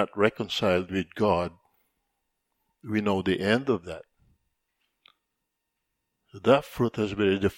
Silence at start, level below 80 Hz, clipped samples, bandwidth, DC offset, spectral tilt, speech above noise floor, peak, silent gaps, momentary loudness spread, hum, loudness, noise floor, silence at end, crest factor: 0 s; -58 dBFS; under 0.1%; 17 kHz; under 0.1%; -6 dB/octave; 56 dB; -6 dBFS; none; 9 LU; none; -26 LUFS; -82 dBFS; 0.05 s; 24 dB